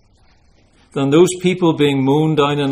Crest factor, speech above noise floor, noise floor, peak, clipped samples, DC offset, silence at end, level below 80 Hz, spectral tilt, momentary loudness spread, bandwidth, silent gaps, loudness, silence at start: 16 dB; 38 dB; -52 dBFS; 0 dBFS; under 0.1%; under 0.1%; 0 s; -52 dBFS; -6 dB/octave; 5 LU; 15 kHz; none; -15 LUFS; 0.95 s